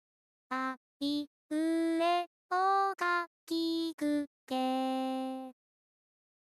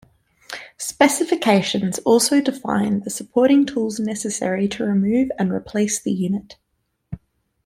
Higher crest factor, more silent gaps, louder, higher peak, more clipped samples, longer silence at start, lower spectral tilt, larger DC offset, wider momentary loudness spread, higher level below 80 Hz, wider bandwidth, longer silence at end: about the same, 16 dB vs 18 dB; first, 0.77-1.00 s, 1.27-1.49 s, 2.27-2.49 s, 3.27-3.47 s, 3.94-3.98 s, 4.27-4.47 s vs none; second, -33 LUFS vs -20 LUFS; second, -18 dBFS vs -2 dBFS; neither; about the same, 0.5 s vs 0.5 s; second, -3 dB/octave vs -4.5 dB/octave; neither; second, 9 LU vs 16 LU; second, -82 dBFS vs -56 dBFS; second, 14 kHz vs 16 kHz; first, 0.95 s vs 0.5 s